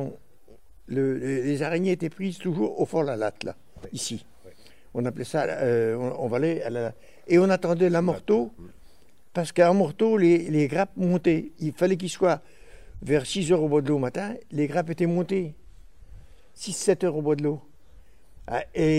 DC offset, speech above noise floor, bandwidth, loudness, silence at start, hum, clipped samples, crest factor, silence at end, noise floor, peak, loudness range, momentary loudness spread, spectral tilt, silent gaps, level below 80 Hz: 0.4%; 33 dB; 13 kHz; -25 LUFS; 0 s; none; under 0.1%; 20 dB; 0 s; -58 dBFS; -6 dBFS; 6 LU; 12 LU; -6 dB/octave; none; -54 dBFS